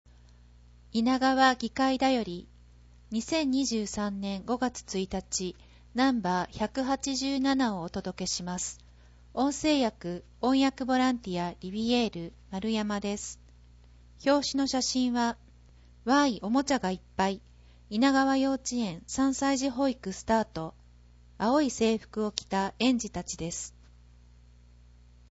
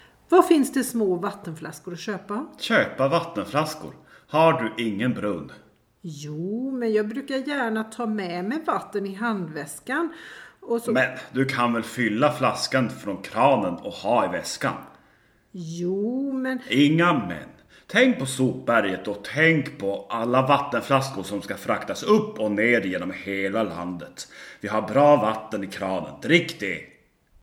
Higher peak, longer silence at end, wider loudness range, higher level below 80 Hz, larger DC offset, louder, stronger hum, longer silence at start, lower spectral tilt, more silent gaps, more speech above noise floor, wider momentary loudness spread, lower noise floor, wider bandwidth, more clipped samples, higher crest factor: second, -8 dBFS vs -2 dBFS; first, 1.65 s vs 0.55 s; about the same, 3 LU vs 5 LU; first, -54 dBFS vs -64 dBFS; neither; second, -29 LUFS vs -24 LUFS; first, 60 Hz at -55 dBFS vs none; first, 0.95 s vs 0.3 s; second, -4 dB/octave vs -5.5 dB/octave; neither; second, 27 dB vs 36 dB; second, 11 LU vs 15 LU; second, -55 dBFS vs -60 dBFS; second, 8 kHz vs 17.5 kHz; neither; about the same, 22 dB vs 22 dB